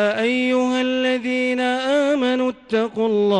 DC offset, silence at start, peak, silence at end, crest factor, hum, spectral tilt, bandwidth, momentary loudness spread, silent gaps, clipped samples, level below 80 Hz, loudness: under 0.1%; 0 s; -8 dBFS; 0 s; 12 dB; none; -5 dB/octave; 10 kHz; 3 LU; none; under 0.1%; -62 dBFS; -20 LUFS